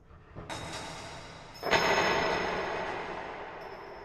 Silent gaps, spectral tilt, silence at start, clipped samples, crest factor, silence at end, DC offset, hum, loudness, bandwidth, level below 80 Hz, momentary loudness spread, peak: none; -3.5 dB/octave; 0 s; under 0.1%; 22 dB; 0 s; under 0.1%; none; -31 LUFS; 13.5 kHz; -54 dBFS; 19 LU; -12 dBFS